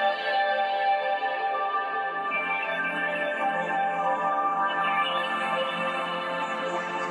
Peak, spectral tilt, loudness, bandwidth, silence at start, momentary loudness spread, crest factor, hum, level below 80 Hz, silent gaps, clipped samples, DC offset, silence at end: -14 dBFS; -4 dB/octave; -26 LUFS; 11.5 kHz; 0 s; 4 LU; 12 dB; none; -88 dBFS; none; under 0.1%; under 0.1%; 0 s